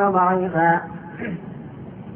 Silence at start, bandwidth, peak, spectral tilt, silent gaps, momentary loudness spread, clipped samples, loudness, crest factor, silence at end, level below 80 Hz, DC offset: 0 s; 3.5 kHz; -6 dBFS; -11.5 dB/octave; none; 18 LU; under 0.1%; -21 LUFS; 16 dB; 0 s; -56 dBFS; under 0.1%